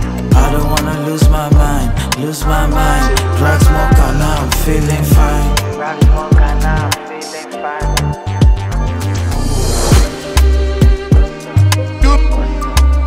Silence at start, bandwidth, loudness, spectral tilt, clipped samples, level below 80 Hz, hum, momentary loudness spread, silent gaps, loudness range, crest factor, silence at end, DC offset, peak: 0 s; 16.5 kHz; -13 LUFS; -5.5 dB/octave; under 0.1%; -14 dBFS; none; 7 LU; none; 3 LU; 10 dB; 0 s; under 0.1%; 0 dBFS